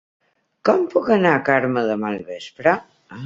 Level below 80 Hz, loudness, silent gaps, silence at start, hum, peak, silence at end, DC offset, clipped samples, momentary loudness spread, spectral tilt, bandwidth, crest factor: -62 dBFS; -19 LUFS; none; 0.65 s; none; -2 dBFS; 0 s; under 0.1%; under 0.1%; 10 LU; -7 dB/octave; 7.8 kHz; 18 dB